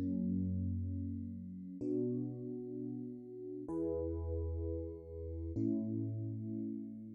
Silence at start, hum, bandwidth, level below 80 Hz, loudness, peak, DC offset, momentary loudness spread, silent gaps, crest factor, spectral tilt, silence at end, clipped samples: 0 s; none; 2.2 kHz; -52 dBFS; -41 LUFS; -26 dBFS; under 0.1%; 9 LU; none; 14 dB; -15 dB/octave; 0 s; under 0.1%